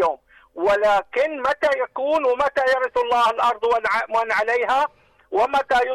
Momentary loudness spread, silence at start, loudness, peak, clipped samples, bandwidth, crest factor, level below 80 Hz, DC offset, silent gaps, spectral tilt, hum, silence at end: 5 LU; 0 s; -20 LUFS; -12 dBFS; under 0.1%; 14 kHz; 8 dB; -54 dBFS; under 0.1%; none; -3 dB/octave; none; 0 s